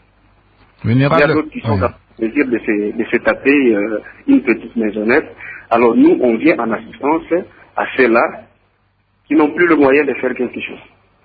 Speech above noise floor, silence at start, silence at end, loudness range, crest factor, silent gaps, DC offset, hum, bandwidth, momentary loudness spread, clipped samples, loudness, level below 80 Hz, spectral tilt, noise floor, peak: 45 dB; 0.85 s; 0.45 s; 2 LU; 16 dB; none; under 0.1%; none; 5 kHz; 11 LU; under 0.1%; -15 LUFS; -44 dBFS; -10 dB/octave; -59 dBFS; 0 dBFS